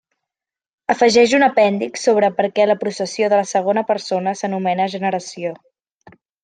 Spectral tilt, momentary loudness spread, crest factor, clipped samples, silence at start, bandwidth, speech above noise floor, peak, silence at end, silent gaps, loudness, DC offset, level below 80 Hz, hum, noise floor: -4.5 dB/octave; 10 LU; 16 dB; under 0.1%; 0.9 s; 9.6 kHz; 71 dB; -2 dBFS; 0.9 s; none; -17 LUFS; under 0.1%; -64 dBFS; none; -87 dBFS